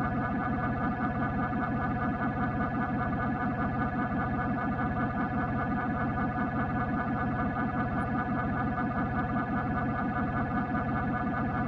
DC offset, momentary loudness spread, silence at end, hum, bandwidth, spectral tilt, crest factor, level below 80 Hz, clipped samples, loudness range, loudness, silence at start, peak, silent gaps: under 0.1%; 0 LU; 0 s; none; 5.8 kHz; -10 dB/octave; 12 dB; -46 dBFS; under 0.1%; 0 LU; -31 LUFS; 0 s; -18 dBFS; none